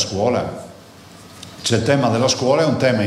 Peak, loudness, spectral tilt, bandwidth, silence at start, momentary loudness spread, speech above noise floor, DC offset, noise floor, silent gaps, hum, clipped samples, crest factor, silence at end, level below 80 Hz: -2 dBFS; -18 LUFS; -4.5 dB/octave; 14.5 kHz; 0 s; 21 LU; 25 dB; under 0.1%; -42 dBFS; none; none; under 0.1%; 16 dB; 0 s; -54 dBFS